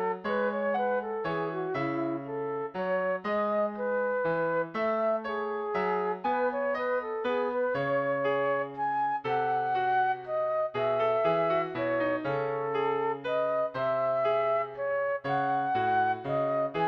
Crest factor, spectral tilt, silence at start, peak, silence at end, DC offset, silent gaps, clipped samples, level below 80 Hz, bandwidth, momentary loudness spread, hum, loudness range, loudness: 14 dB; -8 dB/octave; 0 s; -16 dBFS; 0 s; under 0.1%; none; under 0.1%; -66 dBFS; 6.2 kHz; 4 LU; none; 2 LU; -29 LUFS